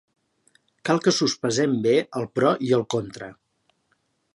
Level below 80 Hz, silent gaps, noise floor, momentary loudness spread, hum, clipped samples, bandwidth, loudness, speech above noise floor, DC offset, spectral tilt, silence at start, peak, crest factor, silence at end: -66 dBFS; none; -70 dBFS; 14 LU; none; under 0.1%; 11.5 kHz; -23 LUFS; 48 dB; under 0.1%; -4.5 dB/octave; 0.85 s; -4 dBFS; 20 dB; 1.05 s